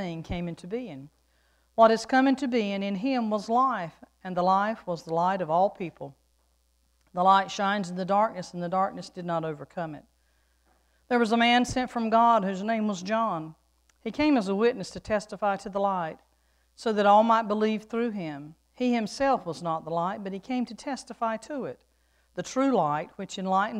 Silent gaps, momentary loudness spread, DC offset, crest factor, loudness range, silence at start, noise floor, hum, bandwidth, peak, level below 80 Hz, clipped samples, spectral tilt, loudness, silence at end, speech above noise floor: none; 15 LU; under 0.1%; 22 dB; 5 LU; 0 s; -68 dBFS; none; 11.5 kHz; -6 dBFS; -58 dBFS; under 0.1%; -5.5 dB/octave; -27 LUFS; 0 s; 42 dB